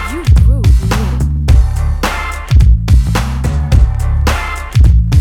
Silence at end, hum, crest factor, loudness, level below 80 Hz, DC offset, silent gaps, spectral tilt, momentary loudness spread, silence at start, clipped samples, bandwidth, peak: 0 s; none; 10 dB; -12 LUFS; -12 dBFS; under 0.1%; none; -6 dB/octave; 7 LU; 0 s; 0.3%; 14.5 kHz; 0 dBFS